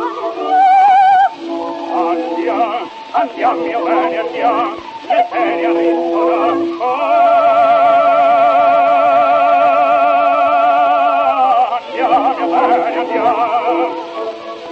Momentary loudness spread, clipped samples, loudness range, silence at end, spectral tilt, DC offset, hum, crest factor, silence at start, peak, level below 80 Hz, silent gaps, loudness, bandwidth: 10 LU; under 0.1%; 6 LU; 0 s; -5 dB/octave; under 0.1%; none; 12 dB; 0 s; -2 dBFS; -62 dBFS; none; -13 LUFS; 7.4 kHz